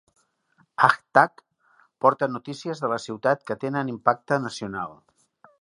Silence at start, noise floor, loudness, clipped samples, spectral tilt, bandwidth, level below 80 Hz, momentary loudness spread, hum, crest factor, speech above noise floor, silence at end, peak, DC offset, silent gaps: 0.8 s; -65 dBFS; -24 LUFS; under 0.1%; -5.5 dB/octave; 11 kHz; -68 dBFS; 12 LU; none; 24 dB; 41 dB; 0.7 s; 0 dBFS; under 0.1%; none